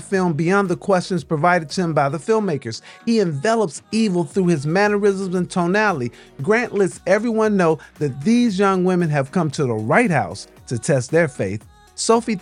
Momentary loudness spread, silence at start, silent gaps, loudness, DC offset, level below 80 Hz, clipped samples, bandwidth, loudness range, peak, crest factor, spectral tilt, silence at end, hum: 9 LU; 0 s; none; -19 LUFS; under 0.1%; -56 dBFS; under 0.1%; 11 kHz; 2 LU; -2 dBFS; 16 dB; -6 dB/octave; 0 s; none